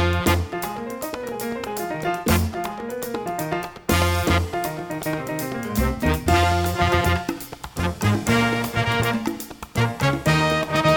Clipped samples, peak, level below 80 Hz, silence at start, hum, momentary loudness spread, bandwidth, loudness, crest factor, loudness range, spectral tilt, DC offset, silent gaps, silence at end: under 0.1%; -4 dBFS; -34 dBFS; 0 s; none; 10 LU; over 20 kHz; -23 LUFS; 18 dB; 4 LU; -5 dB/octave; under 0.1%; none; 0 s